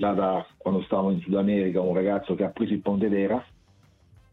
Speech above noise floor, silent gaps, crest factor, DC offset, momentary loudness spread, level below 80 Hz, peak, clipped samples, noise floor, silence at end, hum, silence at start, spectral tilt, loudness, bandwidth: 34 dB; none; 14 dB; under 0.1%; 4 LU; -58 dBFS; -10 dBFS; under 0.1%; -59 dBFS; 0.9 s; none; 0 s; -10 dB/octave; -26 LUFS; 4.1 kHz